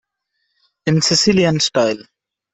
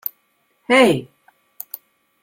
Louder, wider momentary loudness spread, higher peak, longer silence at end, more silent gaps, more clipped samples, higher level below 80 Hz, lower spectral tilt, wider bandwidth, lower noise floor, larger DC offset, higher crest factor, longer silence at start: about the same, -15 LUFS vs -16 LUFS; second, 11 LU vs 23 LU; about the same, -2 dBFS vs -2 dBFS; second, 0.5 s vs 1.2 s; neither; neither; first, -52 dBFS vs -60 dBFS; about the same, -4 dB/octave vs -4.5 dB/octave; second, 8.4 kHz vs 16.5 kHz; first, -72 dBFS vs -65 dBFS; neither; about the same, 16 dB vs 20 dB; first, 0.85 s vs 0.7 s